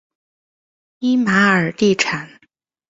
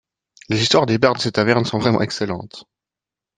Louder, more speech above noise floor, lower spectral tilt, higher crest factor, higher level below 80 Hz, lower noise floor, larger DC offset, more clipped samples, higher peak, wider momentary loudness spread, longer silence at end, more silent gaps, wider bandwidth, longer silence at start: about the same, -16 LUFS vs -18 LUFS; second, 45 dB vs 70 dB; about the same, -5 dB/octave vs -5 dB/octave; about the same, 18 dB vs 18 dB; about the same, -58 dBFS vs -56 dBFS; second, -61 dBFS vs -88 dBFS; neither; neither; about the same, -2 dBFS vs -2 dBFS; about the same, 9 LU vs 10 LU; about the same, 0.65 s vs 0.75 s; neither; second, 7.8 kHz vs 9.6 kHz; first, 1 s vs 0.5 s